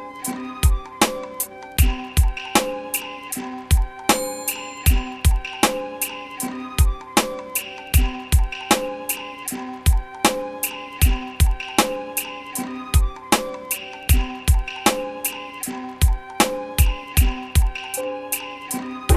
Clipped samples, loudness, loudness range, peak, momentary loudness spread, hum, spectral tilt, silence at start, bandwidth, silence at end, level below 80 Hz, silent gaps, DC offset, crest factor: under 0.1%; -22 LUFS; 1 LU; -2 dBFS; 8 LU; none; -4 dB/octave; 0 s; 14 kHz; 0 s; -24 dBFS; none; under 0.1%; 20 dB